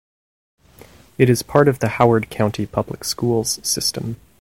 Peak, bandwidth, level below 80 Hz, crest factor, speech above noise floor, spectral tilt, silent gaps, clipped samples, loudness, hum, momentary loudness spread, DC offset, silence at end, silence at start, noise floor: 0 dBFS; 17 kHz; -48 dBFS; 20 dB; 28 dB; -4.5 dB/octave; none; under 0.1%; -19 LUFS; none; 9 LU; 0.2%; 0.25 s; 1.2 s; -46 dBFS